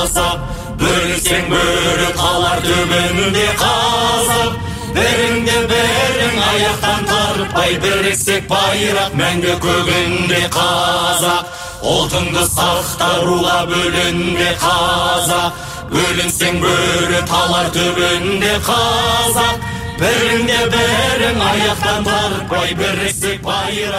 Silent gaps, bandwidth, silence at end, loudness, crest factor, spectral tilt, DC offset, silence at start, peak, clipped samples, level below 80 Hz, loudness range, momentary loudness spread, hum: none; 16 kHz; 0 s; -14 LUFS; 12 dB; -3 dB/octave; under 0.1%; 0 s; -2 dBFS; under 0.1%; -32 dBFS; 1 LU; 4 LU; none